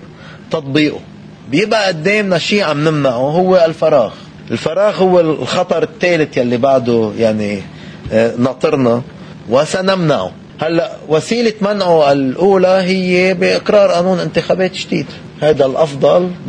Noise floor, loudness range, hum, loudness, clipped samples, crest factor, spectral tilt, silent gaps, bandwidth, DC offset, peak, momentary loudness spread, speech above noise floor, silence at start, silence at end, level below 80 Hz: -34 dBFS; 3 LU; none; -13 LUFS; under 0.1%; 14 dB; -6 dB/octave; none; 10 kHz; under 0.1%; 0 dBFS; 9 LU; 21 dB; 0 s; 0 s; -48 dBFS